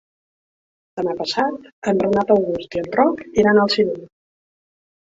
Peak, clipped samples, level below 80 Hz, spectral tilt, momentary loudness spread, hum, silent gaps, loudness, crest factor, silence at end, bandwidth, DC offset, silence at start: -2 dBFS; under 0.1%; -54 dBFS; -5.5 dB/octave; 11 LU; none; 1.72-1.82 s; -19 LUFS; 18 dB; 1 s; 7.8 kHz; under 0.1%; 0.95 s